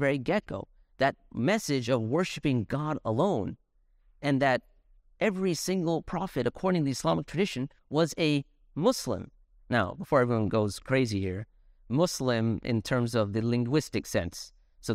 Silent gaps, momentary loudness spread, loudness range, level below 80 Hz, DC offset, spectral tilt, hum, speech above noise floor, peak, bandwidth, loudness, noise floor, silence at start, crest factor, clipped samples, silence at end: none; 9 LU; 1 LU; -56 dBFS; under 0.1%; -5.5 dB/octave; none; 36 dB; -10 dBFS; 16 kHz; -29 LUFS; -65 dBFS; 0 s; 18 dB; under 0.1%; 0 s